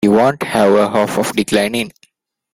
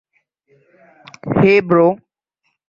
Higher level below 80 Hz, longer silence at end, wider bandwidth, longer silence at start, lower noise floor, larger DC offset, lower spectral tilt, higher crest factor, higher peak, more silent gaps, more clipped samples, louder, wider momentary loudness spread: about the same, -52 dBFS vs -52 dBFS; about the same, 0.65 s vs 0.75 s; first, 16.5 kHz vs 7 kHz; second, 0 s vs 1.25 s; second, -56 dBFS vs -70 dBFS; neither; second, -5 dB/octave vs -8.5 dB/octave; about the same, 14 dB vs 18 dB; about the same, -2 dBFS vs 0 dBFS; neither; neither; about the same, -15 LUFS vs -14 LUFS; second, 7 LU vs 18 LU